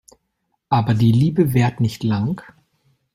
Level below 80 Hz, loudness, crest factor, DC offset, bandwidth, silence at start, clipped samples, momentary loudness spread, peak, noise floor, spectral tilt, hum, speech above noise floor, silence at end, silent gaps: -50 dBFS; -18 LUFS; 16 dB; under 0.1%; 16 kHz; 0.7 s; under 0.1%; 7 LU; -4 dBFS; -72 dBFS; -8 dB/octave; none; 55 dB; 0.75 s; none